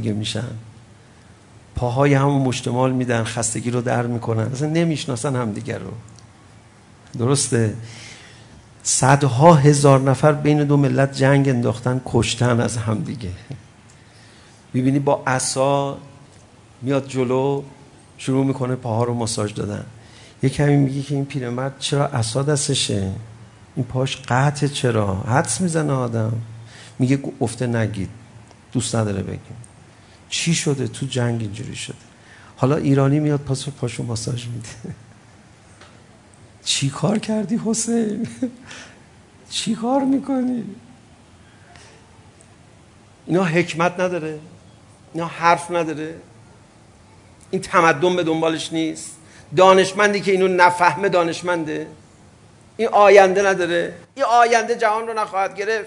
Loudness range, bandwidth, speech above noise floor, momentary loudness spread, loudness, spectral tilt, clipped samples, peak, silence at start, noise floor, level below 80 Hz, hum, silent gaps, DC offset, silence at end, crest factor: 8 LU; 11 kHz; 30 dB; 18 LU; -19 LUFS; -5 dB/octave; under 0.1%; 0 dBFS; 0 s; -48 dBFS; -54 dBFS; none; none; under 0.1%; 0 s; 20 dB